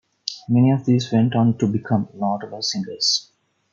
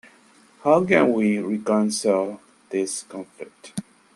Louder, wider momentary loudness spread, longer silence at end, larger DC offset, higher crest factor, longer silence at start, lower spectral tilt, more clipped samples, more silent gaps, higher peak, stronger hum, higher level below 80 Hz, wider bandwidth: about the same, -20 LUFS vs -22 LUFS; second, 8 LU vs 19 LU; first, 0.5 s vs 0.35 s; neither; about the same, 18 dB vs 20 dB; second, 0.25 s vs 0.65 s; about the same, -5.5 dB/octave vs -5 dB/octave; neither; neither; about the same, -2 dBFS vs -2 dBFS; neither; about the same, -64 dBFS vs -66 dBFS; second, 7.6 kHz vs 12.5 kHz